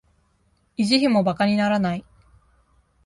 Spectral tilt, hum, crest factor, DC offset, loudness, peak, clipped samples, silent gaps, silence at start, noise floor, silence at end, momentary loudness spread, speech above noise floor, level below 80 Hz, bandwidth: -5.5 dB/octave; none; 20 dB; under 0.1%; -21 LUFS; -4 dBFS; under 0.1%; none; 0.8 s; -65 dBFS; 1.05 s; 12 LU; 45 dB; -56 dBFS; 11.5 kHz